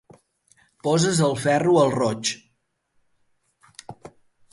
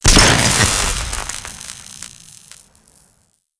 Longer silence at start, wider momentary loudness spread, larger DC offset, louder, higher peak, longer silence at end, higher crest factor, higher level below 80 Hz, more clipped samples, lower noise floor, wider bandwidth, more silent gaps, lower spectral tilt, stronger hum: first, 0.85 s vs 0.05 s; about the same, 24 LU vs 23 LU; neither; second, -21 LUFS vs -14 LUFS; second, -6 dBFS vs 0 dBFS; second, 0.45 s vs 1.5 s; about the same, 18 dB vs 18 dB; second, -62 dBFS vs -26 dBFS; neither; first, -71 dBFS vs -60 dBFS; about the same, 11.5 kHz vs 11 kHz; neither; first, -5 dB/octave vs -2.5 dB/octave; neither